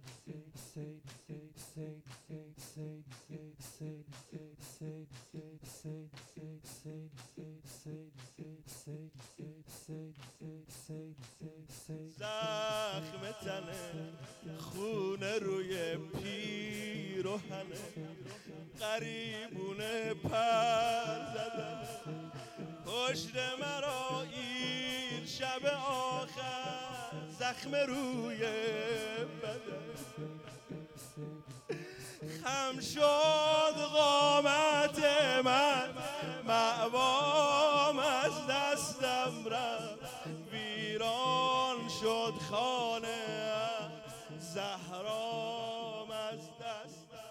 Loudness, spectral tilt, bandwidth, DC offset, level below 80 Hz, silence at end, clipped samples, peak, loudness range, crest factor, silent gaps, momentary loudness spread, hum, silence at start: -35 LUFS; -3.5 dB/octave; 17 kHz; under 0.1%; -72 dBFS; 0 s; under 0.1%; -14 dBFS; 20 LU; 22 dB; none; 22 LU; none; 0.05 s